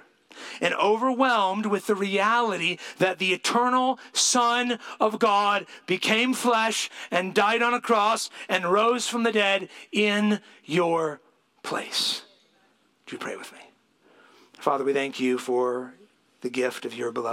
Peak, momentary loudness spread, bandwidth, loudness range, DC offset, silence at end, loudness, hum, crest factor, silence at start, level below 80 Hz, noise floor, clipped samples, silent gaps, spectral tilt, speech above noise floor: -6 dBFS; 11 LU; 16.5 kHz; 8 LU; under 0.1%; 0 s; -24 LUFS; none; 18 dB; 0.35 s; -80 dBFS; -64 dBFS; under 0.1%; none; -3 dB/octave; 40 dB